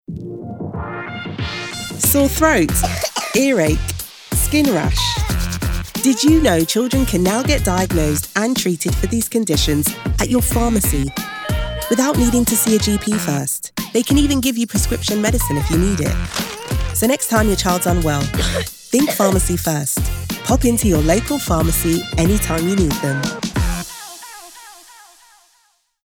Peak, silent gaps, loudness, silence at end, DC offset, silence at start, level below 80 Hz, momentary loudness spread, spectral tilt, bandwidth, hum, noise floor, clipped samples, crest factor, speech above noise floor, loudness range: 0 dBFS; none; -17 LUFS; 1.25 s; under 0.1%; 0.1 s; -26 dBFS; 10 LU; -4.5 dB/octave; over 20 kHz; none; -60 dBFS; under 0.1%; 18 dB; 44 dB; 2 LU